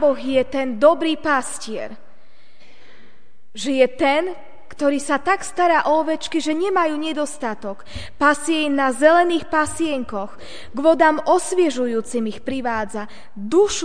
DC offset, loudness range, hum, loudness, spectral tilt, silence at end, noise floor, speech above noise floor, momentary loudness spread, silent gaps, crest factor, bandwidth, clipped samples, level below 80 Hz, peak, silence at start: 3%; 5 LU; none; -19 LUFS; -3.5 dB/octave; 0 s; -57 dBFS; 37 dB; 15 LU; none; 20 dB; 10 kHz; under 0.1%; -52 dBFS; 0 dBFS; 0 s